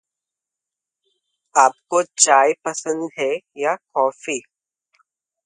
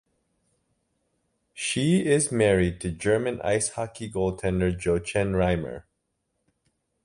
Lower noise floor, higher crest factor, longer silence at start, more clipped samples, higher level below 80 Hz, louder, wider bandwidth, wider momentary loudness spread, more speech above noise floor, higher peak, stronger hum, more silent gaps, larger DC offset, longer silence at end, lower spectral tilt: first, -86 dBFS vs -77 dBFS; about the same, 22 dB vs 18 dB; about the same, 1.55 s vs 1.55 s; neither; second, -76 dBFS vs -44 dBFS; first, -19 LUFS vs -25 LUFS; about the same, 11.5 kHz vs 11.5 kHz; about the same, 12 LU vs 10 LU; first, 67 dB vs 53 dB; first, 0 dBFS vs -8 dBFS; neither; neither; neither; second, 1.05 s vs 1.25 s; second, -1 dB/octave vs -5 dB/octave